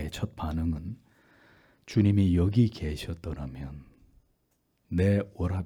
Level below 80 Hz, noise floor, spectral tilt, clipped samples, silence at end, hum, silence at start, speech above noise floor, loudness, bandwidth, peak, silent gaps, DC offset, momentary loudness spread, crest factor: -46 dBFS; -73 dBFS; -8 dB/octave; under 0.1%; 0 s; none; 0 s; 46 dB; -28 LUFS; 13 kHz; -12 dBFS; none; under 0.1%; 18 LU; 18 dB